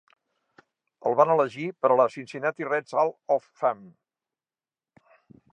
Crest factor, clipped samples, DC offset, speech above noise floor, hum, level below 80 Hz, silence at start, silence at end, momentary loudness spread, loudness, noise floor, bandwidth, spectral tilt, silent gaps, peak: 22 dB; under 0.1%; under 0.1%; over 65 dB; none; -82 dBFS; 1.05 s; 1.65 s; 9 LU; -25 LUFS; under -90 dBFS; 9.4 kHz; -6.5 dB/octave; none; -6 dBFS